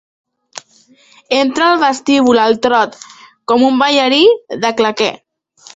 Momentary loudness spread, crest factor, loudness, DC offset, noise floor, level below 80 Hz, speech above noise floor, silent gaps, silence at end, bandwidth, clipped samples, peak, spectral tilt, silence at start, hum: 18 LU; 14 dB; -12 LUFS; under 0.1%; -43 dBFS; -58 dBFS; 31 dB; none; 0.6 s; 8 kHz; under 0.1%; 0 dBFS; -3 dB/octave; 0.55 s; none